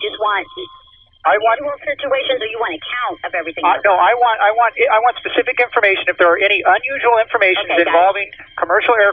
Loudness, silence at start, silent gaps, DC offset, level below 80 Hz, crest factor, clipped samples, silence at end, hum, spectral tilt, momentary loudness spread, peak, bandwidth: -15 LUFS; 0 s; none; under 0.1%; -56 dBFS; 16 dB; under 0.1%; 0 s; none; -6 dB/octave; 10 LU; 0 dBFS; 4.9 kHz